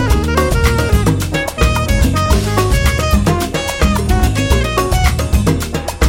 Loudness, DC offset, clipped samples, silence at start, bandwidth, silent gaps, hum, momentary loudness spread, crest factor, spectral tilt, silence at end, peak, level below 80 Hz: -14 LUFS; under 0.1%; under 0.1%; 0 s; 17 kHz; none; none; 3 LU; 12 dB; -5 dB/octave; 0 s; 0 dBFS; -16 dBFS